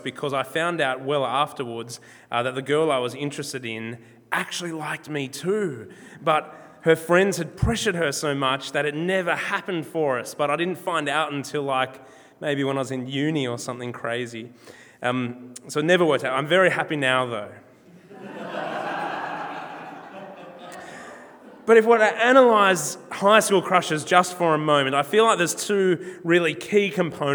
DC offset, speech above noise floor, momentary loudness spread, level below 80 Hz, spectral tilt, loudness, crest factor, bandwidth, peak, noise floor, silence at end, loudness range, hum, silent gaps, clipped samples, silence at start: under 0.1%; 26 dB; 19 LU; -50 dBFS; -4.5 dB/octave; -22 LUFS; 22 dB; over 20 kHz; 0 dBFS; -49 dBFS; 0 s; 10 LU; none; none; under 0.1%; 0 s